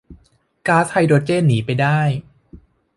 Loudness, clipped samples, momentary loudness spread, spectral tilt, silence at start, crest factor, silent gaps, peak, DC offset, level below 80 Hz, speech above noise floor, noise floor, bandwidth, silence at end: -17 LUFS; under 0.1%; 7 LU; -7 dB/octave; 0.1 s; 16 dB; none; -2 dBFS; under 0.1%; -50 dBFS; 40 dB; -56 dBFS; 11.5 kHz; 0.4 s